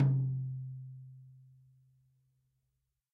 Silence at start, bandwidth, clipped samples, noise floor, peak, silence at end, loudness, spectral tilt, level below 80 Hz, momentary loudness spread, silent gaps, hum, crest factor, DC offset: 0 s; 1.9 kHz; under 0.1%; -83 dBFS; -18 dBFS; 1.75 s; -36 LUFS; -12 dB/octave; -72 dBFS; 24 LU; none; none; 20 dB; under 0.1%